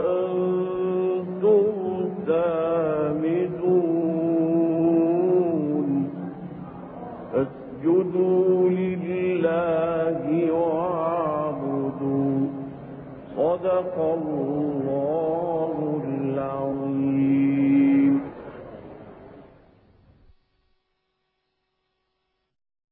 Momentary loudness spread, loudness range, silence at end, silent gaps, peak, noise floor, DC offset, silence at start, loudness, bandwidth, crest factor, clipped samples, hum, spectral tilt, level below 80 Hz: 15 LU; 4 LU; 3.5 s; none; -10 dBFS; -76 dBFS; under 0.1%; 0 s; -23 LUFS; 3.8 kHz; 14 dB; under 0.1%; none; -12.5 dB/octave; -60 dBFS